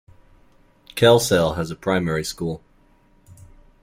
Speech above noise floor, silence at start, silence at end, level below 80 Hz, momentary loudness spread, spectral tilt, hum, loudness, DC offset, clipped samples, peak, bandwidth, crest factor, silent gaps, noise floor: 37 dB; 0.95 s; 0.5 s; -48 dBFS; 15 LU; -4.5 dB/octave; none; -20 LUFS; under 0.1%; under 0.1%; -2 dBFS; 16.5 kHz; 20 dB; none; -56 dBFS